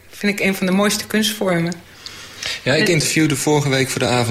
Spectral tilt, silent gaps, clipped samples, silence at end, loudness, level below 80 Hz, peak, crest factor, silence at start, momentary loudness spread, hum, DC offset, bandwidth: -4 dB/octave; none; under 0.1%; 0 s; -17 LUFS; -50 dBFS; -4 dBFS; 14 dB; 0.15 s; 12 LU; none; under 0.1%; 16 kHz